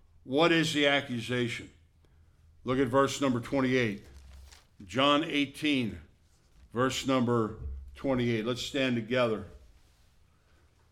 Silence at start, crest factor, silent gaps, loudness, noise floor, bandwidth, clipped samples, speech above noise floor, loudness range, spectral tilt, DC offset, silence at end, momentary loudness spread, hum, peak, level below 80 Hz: 0.25 s; 20 dB; none; -29 LUFS; -64 dBFS; 14.5 kHz; under 0.1%; 35 dB; 3 LU; -5 dB/octave; under 0.1%; 1.35 s; 13 LU; none; -12 dBFS; -54 dBFS